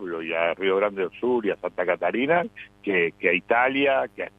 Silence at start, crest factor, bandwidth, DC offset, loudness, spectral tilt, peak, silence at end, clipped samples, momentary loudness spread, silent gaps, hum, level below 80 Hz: 0 s; 18 dB; 4.7 kHz; under 0.1%; -23 LUFS; -7 dB/octave; -6 dBFS; 0.1 s; under 0.1%; 7 LU; none; none; -66 dBFS